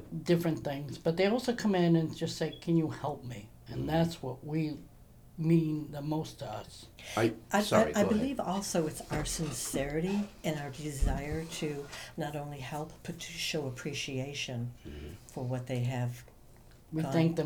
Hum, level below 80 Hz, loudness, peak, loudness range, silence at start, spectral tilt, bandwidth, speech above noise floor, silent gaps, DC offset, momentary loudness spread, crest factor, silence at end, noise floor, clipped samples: none; -48 dBFS; -33 LUFS; -12 dBFS; 7 LU; 0 s; -5.5 dB/octave; over 20 kHz; 23 dB; none; under 0.1%; 14 LU; 22 dB; 0 s; -56 dBFS; under 0.1%